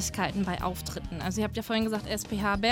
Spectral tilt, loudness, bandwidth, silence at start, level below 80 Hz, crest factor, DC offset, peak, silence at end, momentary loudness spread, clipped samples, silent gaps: -4 dB/octave; -31 LUFS; 17.5 kHz; 0 s; -44 dBFS; 18 dB; under 0.1%; -12 dBFS; 0 s; 5 LU; under 0.1%; none